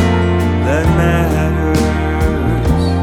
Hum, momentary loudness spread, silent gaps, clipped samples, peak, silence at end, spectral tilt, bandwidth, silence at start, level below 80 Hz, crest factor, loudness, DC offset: none; 3 LU; none; under 0.1%; -2 dBFS; 0 s; -7 dB/octave; 14.5 kHz; 0 s; -20 dBFS; 12 dB; -14 LUFS; under 0.1%